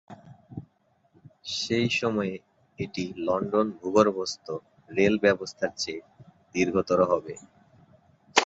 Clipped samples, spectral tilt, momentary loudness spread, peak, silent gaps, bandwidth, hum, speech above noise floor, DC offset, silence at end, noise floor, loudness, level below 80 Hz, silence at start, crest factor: under 0.1%; -4.5 dB/octave; 20 LU; -2 dBFS; none; 8 kHz; none; 41 dB; under 0.1%; 0 s; -67 dBFS; -27 LUFS; -60 dBFS; 0.1 s; 26 dB